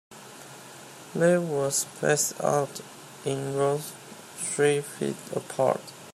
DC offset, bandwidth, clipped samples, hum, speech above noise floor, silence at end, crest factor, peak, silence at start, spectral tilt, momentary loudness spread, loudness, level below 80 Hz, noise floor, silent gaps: under 0.1%; 15.5 kHz; under 0.1%; none; 19 dB; 0 s; 18 dB; -10 dBFS; 0.1 s; -4 dB/octave; 20 LU; -27 LUFS; -74 dBFS; -45 dBFS; none